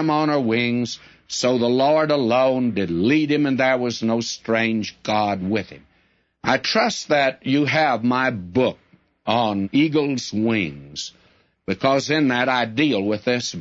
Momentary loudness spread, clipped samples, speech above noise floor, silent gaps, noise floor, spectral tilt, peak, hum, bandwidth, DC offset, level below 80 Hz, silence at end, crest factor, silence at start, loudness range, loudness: 9 LU; under 0.1%; 43 dB; none; -63 dBFS; -5 dB/octave; -4 dBFS; none; 8 kHz; under 0.1%; -60 dBFS; 0 s; 16 dB; 0 s; 3 LU; -20 LUFS